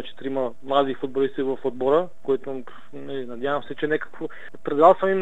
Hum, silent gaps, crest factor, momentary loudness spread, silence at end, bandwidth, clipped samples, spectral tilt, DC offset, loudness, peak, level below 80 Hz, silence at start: none; none; 22 dB; 18 LU; 0 s; 8 kHz; under 0.1%; -7 dB/octave; 2%; -23 LUFS; -2 dBFS; -66 dBFS; 0 s